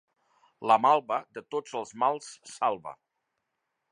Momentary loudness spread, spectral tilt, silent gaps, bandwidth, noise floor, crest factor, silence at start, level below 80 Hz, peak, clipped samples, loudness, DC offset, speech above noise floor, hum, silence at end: 16 LU; -4 dB/octave; none; 11 kHz; -82 dBFS; 22 dB; 0.6 s; -82 dBFS; -8 dBFS; under 0.1%; -28 LUFS; under 0.1%; 54 dB; none; 0.95 s